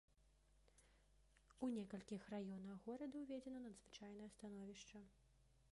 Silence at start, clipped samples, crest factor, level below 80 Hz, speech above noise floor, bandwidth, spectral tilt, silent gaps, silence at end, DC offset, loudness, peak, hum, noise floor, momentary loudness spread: 0.15 s; under 0.1%; 20 dB; -78 dBFS; 23 dB; 11.5 kHz; -6 dB/octave; none; 0.05 s; under 0.1%; -54 LUFS; -36 dBFS; none; -76 dBFS; 11 LU